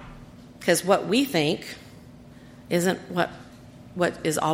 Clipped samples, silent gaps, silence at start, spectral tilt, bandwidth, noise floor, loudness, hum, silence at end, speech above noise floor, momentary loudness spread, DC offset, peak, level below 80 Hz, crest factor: under 0.1%; none; 0 s; -4.5 dB/octave; 16.5 kHz; -47 dBFS; -25 LUFS; none; 0 s; 23 dB; 20 LU; under 0.1%; -6 dBFS; -56 dBFS; 22 dB